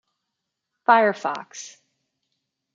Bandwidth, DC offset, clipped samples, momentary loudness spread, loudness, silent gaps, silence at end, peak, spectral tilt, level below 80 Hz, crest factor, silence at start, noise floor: 7.6 kHz; under 0.1%; under 0.1%; 21 LU; -20 LUFS; none; 1.05 s; -2 dBFS; -3.5 dB/octave; -78 dBFS; 24 dB; 0.9 s; -81 dBFS